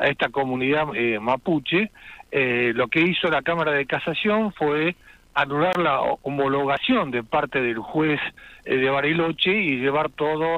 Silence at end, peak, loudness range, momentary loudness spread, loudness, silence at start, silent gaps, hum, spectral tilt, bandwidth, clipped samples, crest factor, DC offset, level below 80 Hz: 0 s; -6 dBFS; 1 LU; 5 LU; -22 LUFS; 0 s; none; none; -7 dB/octave; 12.5 kHz; under 0.1%; 16 dB; under 0.1%; -56 dBFS